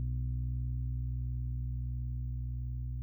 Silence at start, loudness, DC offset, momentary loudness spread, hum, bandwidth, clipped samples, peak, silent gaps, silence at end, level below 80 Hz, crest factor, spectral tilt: 0 s; -38 LUFS; under 0.1%; 3 LU; 60 Hz at -70 dBFS; 0.3 kHz; under 0.1%; -28 dBFS; none; 0 s; -38 dBFS; 6 dB; -13.5 dB/octave